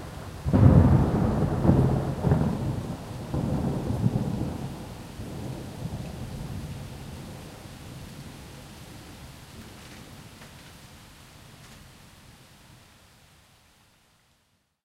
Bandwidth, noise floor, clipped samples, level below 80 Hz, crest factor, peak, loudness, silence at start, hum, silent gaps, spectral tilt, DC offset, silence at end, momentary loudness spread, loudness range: 15.5 kHz; -70 dBFS; under 0.1%; -40 dBFS; 24 dB; -4 dBFS; -26 LUFS; 0 s; none; none; -8 dB/octave; under 0.1%; 2.55 s; 25 LU; 25 LU